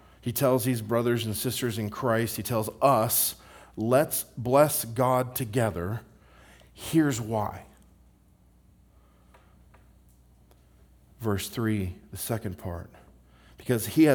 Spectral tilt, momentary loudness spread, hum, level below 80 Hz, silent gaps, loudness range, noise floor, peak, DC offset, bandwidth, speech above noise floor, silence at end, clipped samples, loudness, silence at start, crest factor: -5 dB/octave; 15 LU; 60 Hz at -55 dBFS; -58 dBFS; none; 10 LU; -60 dBFS; -6 dBFS; under 0.1%; over 20 kHz; 33 dB; 0 s; under 0.1%; -27 LUFS; 0.25 s; 22 dB